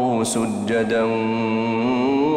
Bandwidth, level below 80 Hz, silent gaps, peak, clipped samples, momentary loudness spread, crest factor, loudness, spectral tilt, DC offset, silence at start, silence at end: 15 kHz; -56 dBFS; none; -10 dBFS; under 0.1%; 2 LU; 10 dB; -21 LUFS; -5 dB/octave; under 0.1%; 0 s; 0 s